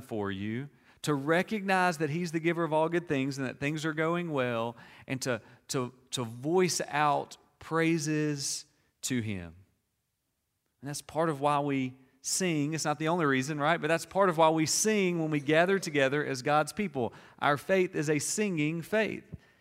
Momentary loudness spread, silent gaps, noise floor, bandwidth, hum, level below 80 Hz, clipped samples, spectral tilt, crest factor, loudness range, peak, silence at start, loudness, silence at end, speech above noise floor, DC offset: 11 LU; none; -81 dBFS; 16 kHz; none; -68 dBFS; under 0.1%; -4.5 dB/octave; 20 dB; 7 LU; -10 dBFS; 0 s; -30 LUFS; 0.25 s; 51 dB; under 0.1%